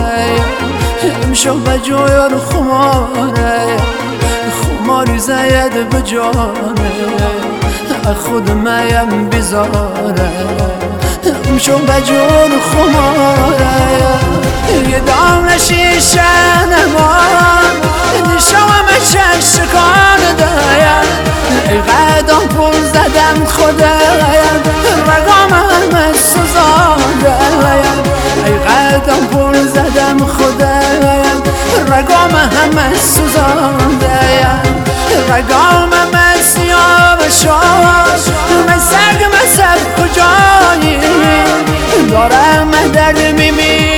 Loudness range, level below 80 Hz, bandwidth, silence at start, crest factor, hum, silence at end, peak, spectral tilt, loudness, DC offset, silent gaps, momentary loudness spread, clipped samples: 6 LU; -22 dBFS; over 20 kHz; 0 s; 8 dB; none; 0 s; 0 dBFS; -4 dB/octave; -8 LUFS; under 0.1%; none; 7 LU; 0.3%